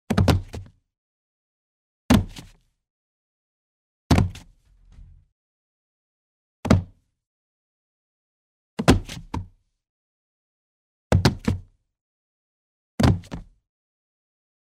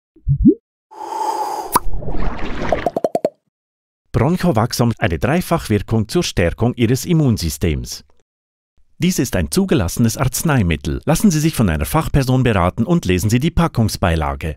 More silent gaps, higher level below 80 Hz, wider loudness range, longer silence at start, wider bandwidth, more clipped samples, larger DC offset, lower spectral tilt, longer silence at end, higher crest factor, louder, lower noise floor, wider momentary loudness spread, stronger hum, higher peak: first, 0.98-2.09 s, 2.90-4.10 s, 5.32-6.63 s, 7.27-8.77 s, 9.89-11.10 s, 12.01-12.98 s vs 0.60-0.90 s, 3.48-4.05 s, 8.22-8.77 s; second, -36 dBFS vs -30 dBFS; about the same, 4 LU vs 4 LU; about the same, 0.1 s vs 0.15 s; about the same, 15.5 kHz vs 16.5 kHz; neither; neither; about the same, -6 dB/octave vs -6 dB/octave; first, 1.3 s vs 0 s; first, 26 dB vs 16 dB; second, -23 LUFS vs -17 LUFS; second, -54 dBFS vs under -90 dBFS; first, 20 LU vs 10 LU; neither; about the same, -2 dBFS vs 0 dBFS